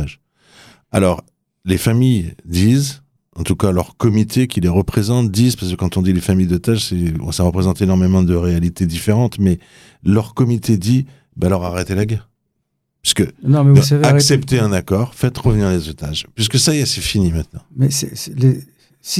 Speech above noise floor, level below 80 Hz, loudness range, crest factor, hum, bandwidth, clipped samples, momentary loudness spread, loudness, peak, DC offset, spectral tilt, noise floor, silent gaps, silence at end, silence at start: 56 dB; -38 dBFS; 4 LU; 16 dB; none; 15.5 kHz; under 0.1%; 9 LU; -16 LUFS; 0 dBFS; under 0.1%; -5.5 dB/octave; -71 dBFS; none; 0 s; 0 s